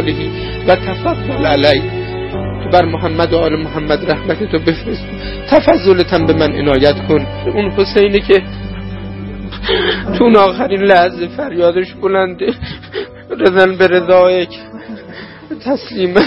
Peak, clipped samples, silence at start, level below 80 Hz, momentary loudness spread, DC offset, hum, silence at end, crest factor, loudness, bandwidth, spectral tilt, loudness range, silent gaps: 0 dBFS; 0.2%; 0 s; -32 dBFS; 16 LU; under 0.1%; none; 0 s; 12 dB; -13 LUFS; 5.8 kHz; -8 dB/octave; 2 LU; none